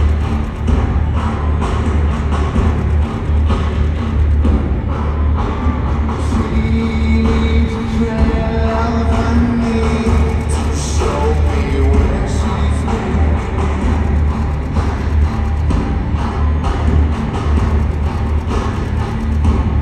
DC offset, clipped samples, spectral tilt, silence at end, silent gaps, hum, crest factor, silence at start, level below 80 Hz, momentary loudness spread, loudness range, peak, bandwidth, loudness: under 0.1%; under 0.1%; -7.5 dB/octave; 0 s; none; none; 14 dB; 0 s; -16 dBFS; 4 LU; 2 LU; 0 dBFS; 9.4 kHz; -16 LUFS